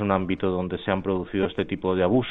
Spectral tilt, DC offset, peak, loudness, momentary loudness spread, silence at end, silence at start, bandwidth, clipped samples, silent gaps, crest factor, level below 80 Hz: -10 dB/octave; under 0.1%; -6 dBFS; -25 LUFS; 5 LU; 0 s; 0 s; 4.1 kHz; under 0.1%; none; 20 dB; -50 dBFS